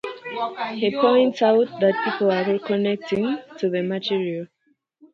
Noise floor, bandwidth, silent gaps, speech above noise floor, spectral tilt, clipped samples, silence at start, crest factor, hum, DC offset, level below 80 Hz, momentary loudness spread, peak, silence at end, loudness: -67 dBFS; 7.2 kHz; none; 46 dB; -7 dB/octave; under 0.1%; 0.05 s; 16 dB; none; under 0.1%; -68 dBFS; 11 LU; -6 dBFS; 0.7 s; -22 LUFS